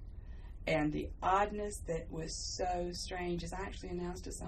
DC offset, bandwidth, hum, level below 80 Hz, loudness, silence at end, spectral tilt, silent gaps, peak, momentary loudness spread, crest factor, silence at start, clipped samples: under 0.1%; 14 kHz; none; -48 dBFS; -37 LUFS; 0 s; -4.5 dB/octave; none; -18 dBFS; 10 LU; 18 dB; 0 s; under 0.1%